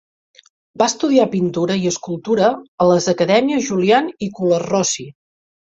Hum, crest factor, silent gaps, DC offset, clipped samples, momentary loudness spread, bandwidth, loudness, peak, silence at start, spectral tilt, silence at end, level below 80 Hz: none; 16 dB; 2.68-2.78 s; under 0.1%; under 0.1%; 7 LU; 8.4 kHz; -17 LUFS; -2 dBFS; 0.75 s; -4.5 dB/octave; 0.55 s; -58 dBFS